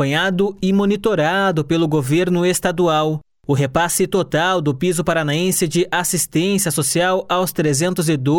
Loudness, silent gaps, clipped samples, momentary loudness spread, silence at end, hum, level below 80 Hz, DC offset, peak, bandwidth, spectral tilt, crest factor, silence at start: -17 LUFS; none; under 0.1%; 2 LU; 0 s; none; -48 dBFS; under 0.1%; -4 dBFS; 18 kHz; -4.5 dB/octave; 14 dB; 0 s